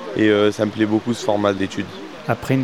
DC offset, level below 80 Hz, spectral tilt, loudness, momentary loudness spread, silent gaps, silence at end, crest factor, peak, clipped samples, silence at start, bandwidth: 0.4%; -56 dBFS; -6 dB/octave; -20 LUFS; 12 LU; none; 0 s; 18 dB; -2 dBFS; under 0.1%; 0 s; 13.5 kHz